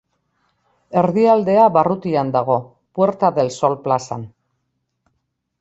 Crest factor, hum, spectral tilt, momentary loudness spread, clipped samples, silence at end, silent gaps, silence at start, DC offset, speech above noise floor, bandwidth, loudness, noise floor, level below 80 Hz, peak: 16 dB; none; -7 dB/octave; 12 LU; under 0.1%; 1.35 s; none; 0.9 s; under 0.1%; 56 dB; 8.2 kHz; -17 LUFS; -72 dBFS; -60 dBFS; -2 dBFS